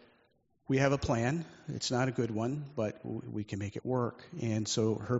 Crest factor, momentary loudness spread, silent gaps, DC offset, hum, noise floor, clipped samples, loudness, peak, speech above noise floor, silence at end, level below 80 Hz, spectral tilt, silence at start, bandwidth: 22 dB; 10 LU; none; under 0.1%; none; -71 dBFS; under 0.1%; -34 LUFS; -12 dBFS; 38 dB; 0 s; -60 dBFS; -5.5 dB/octave; 0.7 s; 8 kHz